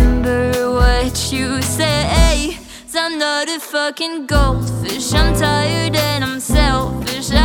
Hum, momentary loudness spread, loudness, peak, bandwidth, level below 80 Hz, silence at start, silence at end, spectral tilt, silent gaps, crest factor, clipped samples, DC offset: none; 6 LU; -17 LUFS; 0 dBFS; 19 kHz; -20 dBFS; 0 s; 0 s; -4.5 dB/octave; none; 14 dB; under 0.1%; under 0.1%